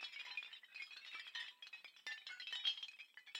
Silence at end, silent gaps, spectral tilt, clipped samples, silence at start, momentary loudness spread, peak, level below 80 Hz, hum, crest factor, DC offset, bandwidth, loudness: 0 s; none; 3.5 dB/octave; under 0.1%; 0 s; 13 LU; -26 dBFS; under -90 dBFS; none; 24 dB; under 0.1%; 16.5 kHz; -47 LUFS